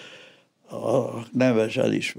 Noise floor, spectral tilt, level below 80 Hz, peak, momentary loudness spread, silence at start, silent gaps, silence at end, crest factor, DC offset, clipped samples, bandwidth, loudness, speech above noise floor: -53 dBFS; -6 dB/octave; -80 dBFS; -8 dBFS; 16 LU; 0 s; none; 0 s; 18 dB; under 0.1%; under 0.1%; 15.5 kHz; -24 LUFS; 30 dB